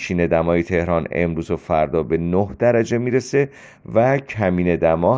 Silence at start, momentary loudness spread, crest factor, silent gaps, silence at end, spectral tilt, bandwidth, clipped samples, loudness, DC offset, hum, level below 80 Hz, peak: 0 s; 4 LU; 14 dB; none; 0 s; -7.5 dB/octave; 7.8 kHz; under 0.1%; -19 LUFS; under 0.1%; none; -46 dBFS; -4 dBFS